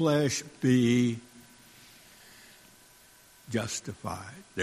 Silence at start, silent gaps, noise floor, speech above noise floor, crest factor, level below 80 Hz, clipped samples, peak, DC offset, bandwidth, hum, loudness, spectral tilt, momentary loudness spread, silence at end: 0 s; none; -57 dBFS; 29 dB; 18 dB; -64 dBFS; under 0.1%; -12 dBFS; under 0.1%; 14.5 kHz; none; -29 LUFS; -5.5 dB/octave; 27 LU; 0 s